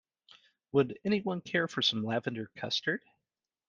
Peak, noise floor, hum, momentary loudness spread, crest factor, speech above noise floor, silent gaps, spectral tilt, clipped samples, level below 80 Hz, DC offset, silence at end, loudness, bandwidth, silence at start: -12 dBFS; -89 dBFS; none; 8 LU; 20 dB; 58 dB; none; -5 dB/octave; under 0.1%; -74 dBFS; under 0.1%; 0.7 s; -32 LUFS; 7.6 kHz; 0.75 s